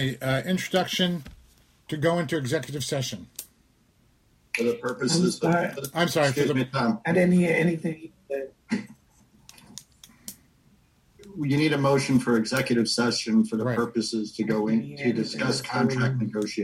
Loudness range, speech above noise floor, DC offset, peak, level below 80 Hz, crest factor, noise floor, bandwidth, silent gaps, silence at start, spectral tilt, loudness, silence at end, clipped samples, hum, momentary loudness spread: 7 LU; 38 dB; under 0.1%; -8 dBFS; -60 dBFS; 18 dB; -63 dBFS; 16 kHz; none; 0 s; -5 dB/octave; -25 LUFS; 0 s; under 0.1%; none; 13 LU